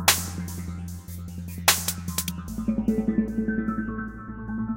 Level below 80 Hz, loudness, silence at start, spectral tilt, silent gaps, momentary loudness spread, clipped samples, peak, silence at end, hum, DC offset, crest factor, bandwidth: -42 dBFS; -27 LUFS; 0 s; -3 dB/octave; none; 15 LU; under 0.1%; -2 dBFS; 0 s; none; under 0.1%; 24 dB; 17 kHz